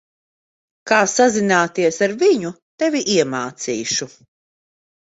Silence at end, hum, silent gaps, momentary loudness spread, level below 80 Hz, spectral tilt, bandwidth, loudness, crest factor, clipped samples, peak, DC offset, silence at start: 1.05 s; none; 2.62-2.78 s; 9 LU; -64 dBFS; -3.5 dB/octave; 8 kHz; -18 LUFS; 18 dB; under 0.1%; -2 dBFS; under 0.1%; 0.85 s